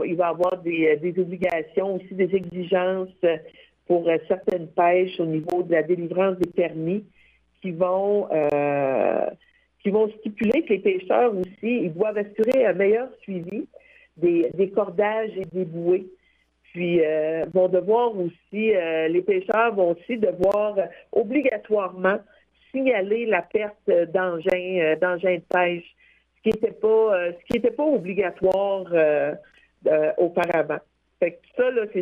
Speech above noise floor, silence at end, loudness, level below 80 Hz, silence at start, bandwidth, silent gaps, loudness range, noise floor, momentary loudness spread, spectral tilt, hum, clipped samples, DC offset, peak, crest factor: 42 dB; 0 s; -23 LUFS; -62 dBFS; 0 s; 7.2 kHz; none; 2 LU; -64 dBFS; 7 LU; -8 dB/octave; none; under 0.1%; under 0.1%; -6 dBFS; 16 dB